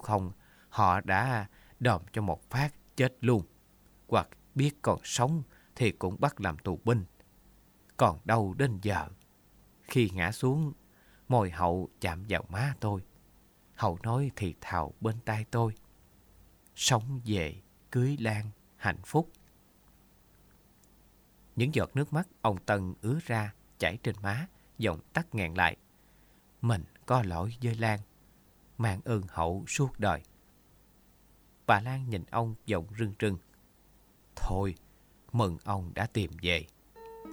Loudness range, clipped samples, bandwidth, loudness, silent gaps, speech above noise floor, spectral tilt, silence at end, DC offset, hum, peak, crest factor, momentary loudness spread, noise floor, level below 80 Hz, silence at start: 4 LU; under 0.1%; over 20 kHz; -32 LUFS; none; 32 dB; -5.5 dB/octave; 0 s; under 0.1%; none; -8 dBFS; 24 dB; 10 LU; -62 dBFS; -52 dBFS; 0 s